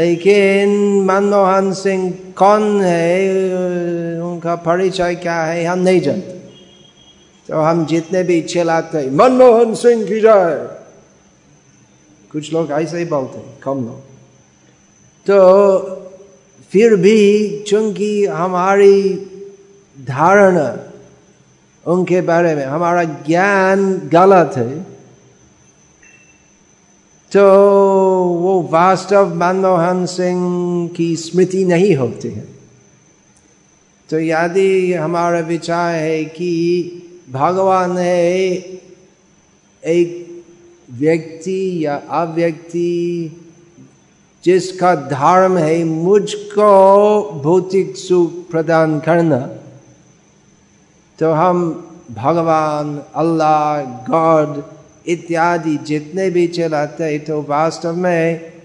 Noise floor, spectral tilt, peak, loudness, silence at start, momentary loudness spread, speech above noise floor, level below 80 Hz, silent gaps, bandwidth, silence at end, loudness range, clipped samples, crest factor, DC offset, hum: -51 dBFS; -6.5 dB/octave; 0 dBFS; -14 LUFS; 0 s; 13 LU; 38 dB; -62 dBFS; none; 11 kHz; 0.15 s; 7 LU; under 0.1%; 14 dB; under 0.1%; none